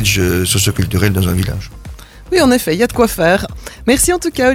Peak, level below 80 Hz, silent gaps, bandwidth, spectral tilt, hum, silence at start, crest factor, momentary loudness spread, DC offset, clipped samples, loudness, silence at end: 0 dBFS; -30 dBFS; none; 17 kHz; -4.5 dB/octave; none; 0 s; 14 dB; 14 LU; under 0.1%; under 0.1%; -14 LUFS; 0 s